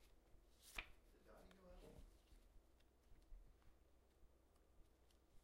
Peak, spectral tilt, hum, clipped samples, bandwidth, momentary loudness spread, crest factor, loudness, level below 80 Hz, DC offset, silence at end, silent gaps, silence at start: -32 dBFS; -3 dB/octave; none; under 0.1%; 15.5 kHz; 13 LU; 34 dB; -61 LUFS; -70 dBFS; under 0.1%; 0 s; none; 0 s